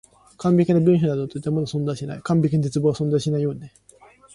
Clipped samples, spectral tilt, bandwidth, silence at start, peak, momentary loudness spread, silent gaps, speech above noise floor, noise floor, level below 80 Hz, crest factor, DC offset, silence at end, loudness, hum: under 0.1%; -8 dB/octave; 11.5 kHz; 0.4 s; -6 dBFS; 10 LU; none; 30 dB; -51 dBFS; -54 dBFS; 14 dB; under 0.1%; 0.65 s; -21 LUFS; none